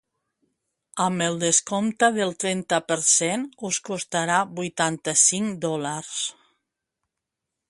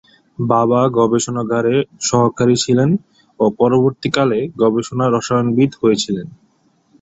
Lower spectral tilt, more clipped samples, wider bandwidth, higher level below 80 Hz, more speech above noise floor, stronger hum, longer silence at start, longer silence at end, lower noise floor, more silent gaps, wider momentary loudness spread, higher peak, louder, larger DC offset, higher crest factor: second, -2.5 dB/octave vs -5.5 dB/octave; neither; first, 11.5 kHz vs 8.2 kHz; second, -70 dBFS vs -52 dBFS; first, 60 dB vs 43 dB; neither; first, 0.95 s vs 0.4 s; first, 1.4 s vs 0.65 s; first, -84 dBFS vs -58 dBFS; neither; first, 11 LU vs 5 LU; second, -4 dBFS vs 0 dBFS; second, -23 LUFS vs -16 LUFS; neither; about the same, 20 dB vs 16 dB